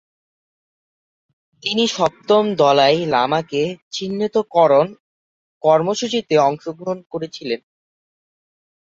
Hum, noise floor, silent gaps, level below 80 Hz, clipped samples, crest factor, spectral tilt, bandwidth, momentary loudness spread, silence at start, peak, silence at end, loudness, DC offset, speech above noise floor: none; under -90 dBFS; 3.82-3.91 s, 5.00-5.61 s, 7.06-7.10 s; -64 dBFS; under 0.1%; 18 dB; -4.5 dB/octave; 8 kHz; 13 LU; 1.65 s; -2 dBFS; 1.3 s; -18 LUFS; under 0.1%; over 73 dB